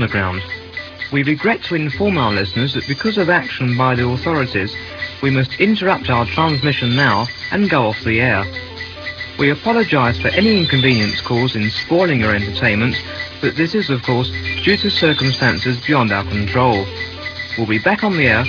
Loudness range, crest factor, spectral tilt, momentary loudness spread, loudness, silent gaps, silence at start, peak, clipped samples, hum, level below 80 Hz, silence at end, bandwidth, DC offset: 2 LU; 16 dB; -6.5 dB/octave; 10 LU; -16 LUFS; none; 0 s; 0 dBFS; under 0.1%; none; -42 dBFS; 0 s; 5.4 kHz; under 0.1%